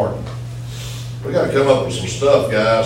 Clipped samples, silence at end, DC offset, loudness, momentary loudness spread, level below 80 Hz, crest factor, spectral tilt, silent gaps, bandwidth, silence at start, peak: under 0.1%; 0 s; under 0.1%; -18 LUFS; 14 LU; -42 dBFS; 18 dB; -5.5 dB/octave; none; 16.5 kHz; 0 s; 0 dBFS